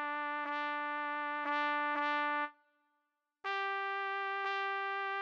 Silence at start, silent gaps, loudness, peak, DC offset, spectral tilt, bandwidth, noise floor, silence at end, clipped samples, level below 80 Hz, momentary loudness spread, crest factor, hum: 0 s; none; -36 LUFS; -22 dBFS; under 0.1%; -1.5 dB/octave; 7.4 kHz; -84 dBFS; 0 s; under 0.1%; under -90 dBFS; 4 LU; 16 dB; none